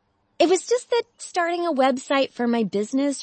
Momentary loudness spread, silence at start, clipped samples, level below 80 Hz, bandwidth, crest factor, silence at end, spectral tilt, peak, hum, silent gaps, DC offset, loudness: 5 LU; 0.4 s; under 0.1%; -74 dBFS; 8.8 kHz; 16 dB; 0 s; -3.5 dB/octave; -6 dBFS; none; none; under 0.1%; -23 LUFS